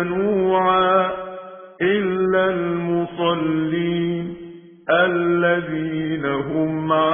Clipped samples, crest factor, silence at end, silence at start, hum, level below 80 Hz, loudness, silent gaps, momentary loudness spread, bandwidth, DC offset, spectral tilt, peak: under 0.1%; 16 dB; 0 s; 0 s; none; -54 dBFS; -20 LUFS; none; 14 LU; 3.6 kHz; under 0.1%; -10.5 dB/octave; -4 dBFS